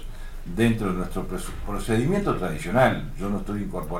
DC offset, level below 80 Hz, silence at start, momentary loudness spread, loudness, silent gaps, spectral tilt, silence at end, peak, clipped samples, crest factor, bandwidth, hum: under 0.1%; -34 dBFS; 0 s; 12 LU; -26 LUFS; none; -6.5 dB/octave; 0 s; -6 dBFS; under 0.1%; 18 dB; 16.5 kHz; none